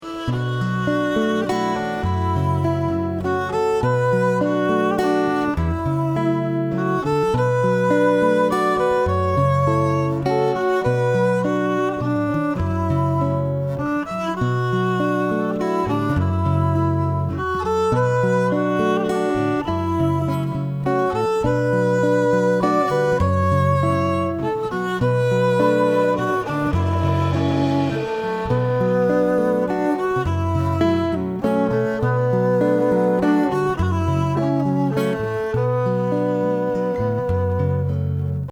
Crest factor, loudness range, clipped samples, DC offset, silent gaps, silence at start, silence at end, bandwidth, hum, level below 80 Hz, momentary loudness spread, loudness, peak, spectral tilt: 12 dB; 3 LU; under 0.1%; under 0.1%; none; 0 s; 0 s; 14 kHz; none; -42 dBFS; 5 LU; -20 LUFS; -6 dBFS; -8 dB/octave